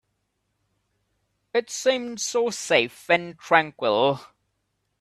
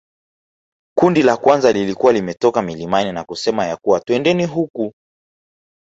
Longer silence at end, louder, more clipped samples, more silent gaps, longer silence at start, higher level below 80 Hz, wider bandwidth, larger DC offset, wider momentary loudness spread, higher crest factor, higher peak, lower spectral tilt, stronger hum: second, 0.75 s vs 0.95 s; second, -23 LUFS vs -17 LUFS; neither; second, none vs 4.70-4.74 s; first, 1.55 s vs 0.95 s; second, -70 dBFS vs -54 dBFS; first, 14 kHz vs 8 kHz; neither; second, 6 LU vs 10 LU; first, 24 dB vs 18 dB; about the same, -2 dBFS vs 0 dBFS; second, -2.5 dB/octave vs -5.5 dB/octave; neither